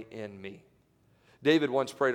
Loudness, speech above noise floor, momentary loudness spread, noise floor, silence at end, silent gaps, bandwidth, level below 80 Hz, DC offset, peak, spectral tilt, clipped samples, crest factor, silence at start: -28 LUFS; 37 dB; 19 LU; -66 dBFS; 0 s; none; 13.5 kHz; -76 dBFS; under 0.1%; -12 dBFS; -5.5 dB/octave; under 0.1%; 18 dB; 0 s